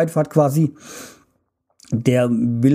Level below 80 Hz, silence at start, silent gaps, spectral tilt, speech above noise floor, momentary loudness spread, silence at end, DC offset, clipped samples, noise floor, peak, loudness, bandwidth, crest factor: -58 dBFS; 0 s; none; -7.5 dB/octave; 50 dB; 19 LU; 0 s; under 0.1%; under 0.1%; -68 dBFS; -2 dBFS; -19 LUFS; 15.5 kHz; 18 dB